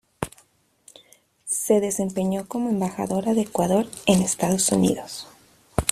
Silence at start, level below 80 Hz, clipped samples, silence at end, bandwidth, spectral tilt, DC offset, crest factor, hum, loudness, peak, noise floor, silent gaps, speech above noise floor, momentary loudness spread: 0.2 s; -48 dBFS; under 0.1%; 0 s; 15 kHz; -4.5 dB/octave; under 0.1%; 24 dB; none; -23 LUFS; 0 dBFS; -60 dBFS; none; 37 dB; 14 LU